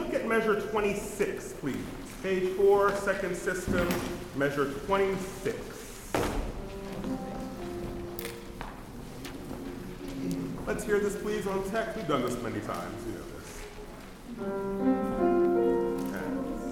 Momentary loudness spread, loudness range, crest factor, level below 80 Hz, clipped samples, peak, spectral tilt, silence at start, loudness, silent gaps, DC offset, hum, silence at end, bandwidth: 16 LU; 10 LU; 18 dB; -46 dBFS; under 0.1%; -14 dBFS; -5.5 dB/octave; 0 s; -31 LUFS; none; under 0.1%; none; 0 s; 18 kHz